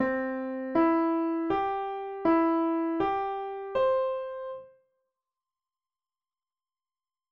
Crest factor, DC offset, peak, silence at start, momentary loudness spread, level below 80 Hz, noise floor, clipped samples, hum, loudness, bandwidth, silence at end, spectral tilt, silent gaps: 16 dB; under 0.1%; -14 dBFS; 0 s; 10 LU; -64 dBFS; under -90 dBFS; under 0.1%; none; -28 LUFS; 5.4 kHz; 2.65 s; -8 dB/octave; none